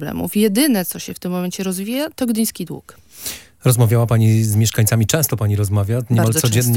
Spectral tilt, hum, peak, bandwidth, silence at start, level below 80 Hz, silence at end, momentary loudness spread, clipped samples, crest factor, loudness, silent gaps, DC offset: -5.5 dB/octave; none; -2 dBFS; 17 kHz; 0 s; -50 dBFS; 0 s; 13 LU; under 0.1%; 16 dB; -17 LUFS; none; under 0.1%